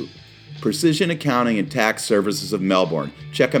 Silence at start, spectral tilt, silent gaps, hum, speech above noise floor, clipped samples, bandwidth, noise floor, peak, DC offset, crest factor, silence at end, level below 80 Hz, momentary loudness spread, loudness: 0 s; -5 dB/octave; none; none; 21 dB; under 0.1%; 19 kHz; -41 dBFS; 0 dBFS; under 0.1%; 20 dB; 0 s; -58 dBFS; 8 LU; -20 LUFS